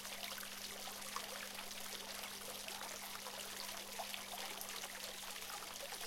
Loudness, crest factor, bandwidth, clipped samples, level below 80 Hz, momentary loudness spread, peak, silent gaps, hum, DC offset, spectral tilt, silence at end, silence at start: -46 LUFS; 22 dB; 17 kHz; under 0.1%; -72 dBFS; 1 LU; -26 dBFS; none; none; under 0.1%; -0.5 dB/octave; 0 s; 0 s